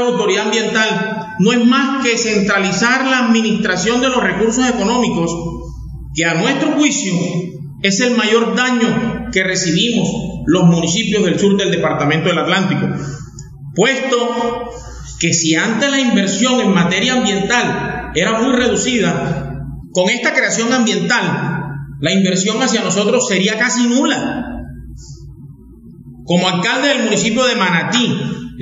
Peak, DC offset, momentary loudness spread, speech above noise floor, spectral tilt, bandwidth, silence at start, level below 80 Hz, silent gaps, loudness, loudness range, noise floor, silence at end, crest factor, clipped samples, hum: 0 dBFS; under 0.1%; 11 LU; 23 dB; -4 dB/octave; 8 kHz; 0 s; -40 dBFS; none; -14 LUFS; 3 LU; -38 dBFS; 0 s; 16 dB; under 0.1%; none